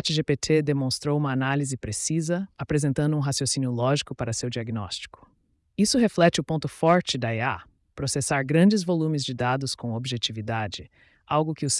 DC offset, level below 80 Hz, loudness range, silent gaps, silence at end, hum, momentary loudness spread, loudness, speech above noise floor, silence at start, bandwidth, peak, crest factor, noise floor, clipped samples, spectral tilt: under 0.1%; -56 dBFS; 3 LU; none; 0 s; none; 10 LU; -25 LUFS; 42 dB; 0.05 s; 12 kHz; -8 dBFS; 16 dB; -67 dBFS; under 0.1%; -5 dB/octave